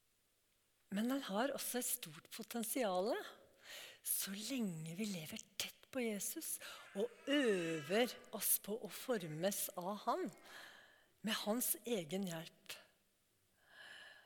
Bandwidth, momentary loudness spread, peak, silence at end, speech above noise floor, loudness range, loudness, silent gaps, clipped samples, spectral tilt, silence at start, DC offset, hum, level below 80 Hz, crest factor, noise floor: 19 kHz; 16 LU; -22 dBFS; 0.05 s; 38 dB; 5 LU; -41 LUFS; none; under 0.1%; -3 dB/octave; 0.9 s; under 0.1%; none; -88 dBFS; 20 dB; -79 dBFS